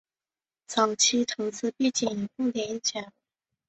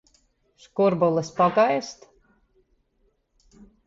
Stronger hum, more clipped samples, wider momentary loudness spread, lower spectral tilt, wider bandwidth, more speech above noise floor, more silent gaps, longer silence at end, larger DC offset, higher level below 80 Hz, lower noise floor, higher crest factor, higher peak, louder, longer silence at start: neither; neither; second, 9 LU vs 13 LU; second, -2 dB/octave vs -6 dB/octave; about the same, 8.2 kHz vs 7.8 kHz; first, over 63 dB vs 46 dB; neither; second, 0.6 s vs 1.95 s; neither; second, -72 dBFS vs -64 dBFS; first, under -90 dBFS vs -68 dBFS; about the same, 20 dB vs 18 dB; about the same, -8 dBFS vs -8 dBFS; second, -27 LUFS vs -22 LUFS; about the same, 0.7 s vs 0.75 s